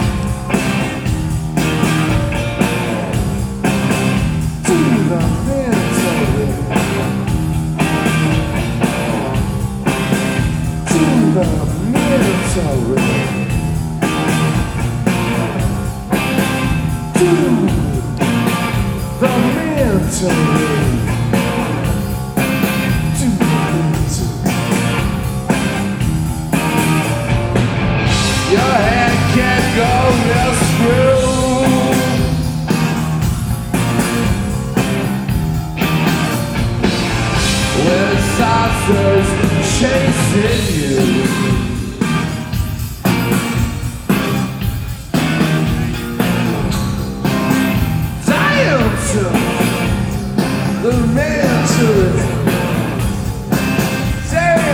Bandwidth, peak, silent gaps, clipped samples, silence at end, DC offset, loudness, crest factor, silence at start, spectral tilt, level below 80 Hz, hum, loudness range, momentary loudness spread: 18 kHz; 0 dBFS; none; under 0.1%; 0 s; under 0.1%; -15 LUFS; 14 dB; 0 s; -5.5 dB/octave; -26 dBFS; none; 3 LU; 6 LU